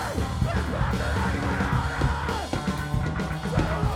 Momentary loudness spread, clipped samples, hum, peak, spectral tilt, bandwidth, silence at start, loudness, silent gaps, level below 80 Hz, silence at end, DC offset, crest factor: 3 LU; under 0.1%; none; -10 dBFS; -6 dB/octave; 16 kHz; 0 s; -27 LUFS; none; -32 dBFS; 0 s; under 0.1%; 16 dB